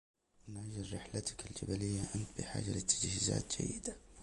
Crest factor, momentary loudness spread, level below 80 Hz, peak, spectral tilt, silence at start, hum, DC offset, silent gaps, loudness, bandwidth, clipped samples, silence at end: 22 dB; 12 LU; -56 dBFS; -18 dBFS; -3.5 dB/octave; 0.45 s; none; under 0.1%; none; -39 LUFS; 11.5 kHz; under 0.1%; 0 s